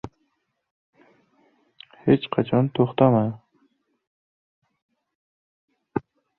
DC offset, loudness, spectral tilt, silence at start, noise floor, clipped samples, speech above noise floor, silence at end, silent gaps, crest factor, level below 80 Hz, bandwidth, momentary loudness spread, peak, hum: under 0.1%; -22 LUFS; -10.5 dB/octave; 0.05 s; -73 dBFS; under 0.1%; 53 dB; 0.4 s; 0.71-0.93 s, 4.07-4.62 s, 4.82-4.89 s, 5.15-5.68 s; 24 dB; -60 dBFS; 4.3 kHz; 14 LU; -4 dBFS; none